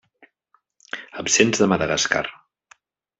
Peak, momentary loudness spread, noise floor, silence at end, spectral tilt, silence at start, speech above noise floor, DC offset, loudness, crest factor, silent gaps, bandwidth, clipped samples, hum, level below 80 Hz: -2 dBFS; 17 LU; -66 dBFS; 0.85 s; -3 dB/octave; 0.95 s; 46 dB; under 0.1%; -19 LUFS; 22 dB; none; 8.4 kHz; under 0.1%; none; -58 dBFS